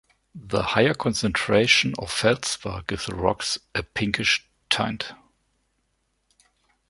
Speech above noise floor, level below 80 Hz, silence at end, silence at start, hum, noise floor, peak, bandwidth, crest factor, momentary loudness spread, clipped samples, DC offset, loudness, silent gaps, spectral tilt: 48 dB; -48 dBFS; 1.75 s; 0.35 s; none; -72 dBFS; -2 dBFS; 11.5 kHz; 24 dB; 11 LU; under 0.1%; under 0.1%; -23 LUFS; none; -3.5 dB/octave